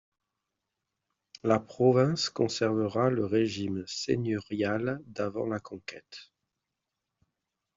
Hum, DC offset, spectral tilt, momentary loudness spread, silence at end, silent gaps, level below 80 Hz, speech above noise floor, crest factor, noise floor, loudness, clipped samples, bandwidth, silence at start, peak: none; under 0.1%; -5.5 dB/octave; 17 LU; 1.55 s; none; -68 dBFS; 57 dB; 20 dB; -86 dBFS; -29 LUFS; under 0.1%; 7.8 kHz; 1.45 s; -10 dBFS